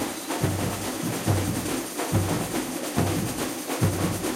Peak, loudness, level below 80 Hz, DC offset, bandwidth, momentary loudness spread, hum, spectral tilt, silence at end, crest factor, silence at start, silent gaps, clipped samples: -10 dBFS; -27 LUFS; -48 dBFS; under 0.1%; 16 kHz; 4 LU; none; -4.5 dB/octave; 0 s; 18 dB; 0 s; none; under 0.1%